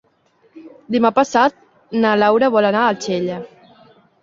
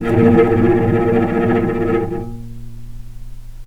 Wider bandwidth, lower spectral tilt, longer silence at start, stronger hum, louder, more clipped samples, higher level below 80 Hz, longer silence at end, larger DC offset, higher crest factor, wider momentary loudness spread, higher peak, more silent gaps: second, 7.6 kHz vs 10.5 kHz; second, -5 dB/octave vs -9.5 dB/octave; first, 0.55 s vs 0 s; neither; about the same, -16 LUFS vs -15 LUFS; neither; second, -62 dBFS vs -32 dBFS; first, 0.75 s vs 0 s; neither; about the same, 18 dB vs 16 dB; second, 10 LU vs 22 LU; about the same, -2 dBFS vs 0 dBFS; neither